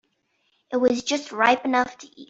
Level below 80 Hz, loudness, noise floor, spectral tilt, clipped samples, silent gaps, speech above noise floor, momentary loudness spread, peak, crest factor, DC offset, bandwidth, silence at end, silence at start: -66 dBFS; -22 LUFS; -70 dBFS; -2.5 dB/octave; under 0.1%; none; 48 dB; 9 LU; -4 dBFS; 20 dB; under 0.1%; 8 kHz; 0.05 s; 0.7 s